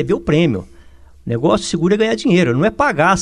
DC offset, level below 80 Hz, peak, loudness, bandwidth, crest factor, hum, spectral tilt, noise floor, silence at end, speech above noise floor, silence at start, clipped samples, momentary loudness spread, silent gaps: 0.4%; -40 dBFS; -2 dBFS; -16 LUFS; 11 kHz; 14 dB; none; -6 dB/octave; -43 dBFS; 0 s; 28 dB; 0 s; under 0.1%; 8 LU; none